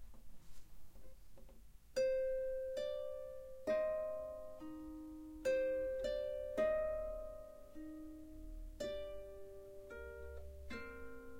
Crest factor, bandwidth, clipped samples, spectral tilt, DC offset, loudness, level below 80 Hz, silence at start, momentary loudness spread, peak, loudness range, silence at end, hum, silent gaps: 16 dB; 16.5 kHz; under 0.1%; -5 dB/octave; under 0.1%; -43 LUFS; -58 dBFS; 0 s; 17 LU; -26 dBFS; 10 LU; 0 s; none; none